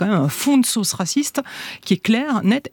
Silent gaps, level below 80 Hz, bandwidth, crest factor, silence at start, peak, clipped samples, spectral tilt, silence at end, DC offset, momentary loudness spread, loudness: none; -66 dBFS; 19 kHz; 16 dB; 0 s; -4 dBFS; under 0.1%; -4.5 dB/octave; 0.05 s; under 0.1%; 9 LU; -19 LUFS